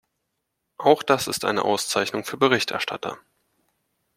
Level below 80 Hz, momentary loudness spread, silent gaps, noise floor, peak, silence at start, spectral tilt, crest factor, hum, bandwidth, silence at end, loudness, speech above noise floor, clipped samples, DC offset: -66 dBFS; 10 LU; none; -78 dBFS; -2 dBFS; 0.8 s; -3 dB/octave; 22 dB; none; 16.5 kHz; 1 s; -22 LUFS; 56 dB; under 0.1%; under 0.1%